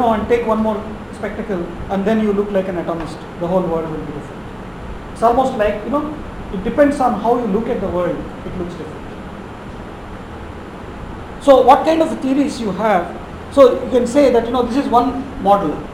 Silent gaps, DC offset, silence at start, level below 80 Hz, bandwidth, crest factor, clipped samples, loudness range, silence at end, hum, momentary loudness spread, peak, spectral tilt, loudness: none; under 0.1%; 0 s; -36 dBFS; 16 kHz; 18 dB; under 0.1%; 8 LU; 0 s; none; 19 LU; 0 dBFS; -6.5 dB/octave; -16 LUFS